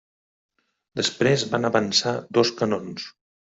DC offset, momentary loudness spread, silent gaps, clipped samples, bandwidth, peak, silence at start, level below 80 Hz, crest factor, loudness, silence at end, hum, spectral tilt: under 0.1%; 15 LU; none; under 0.1%; 8.2 kHz; -4 dBFS; 0.95 s; -64 dBFS; 20 dB; -22 LUFS; 0.45 s; none; -4 dB/octave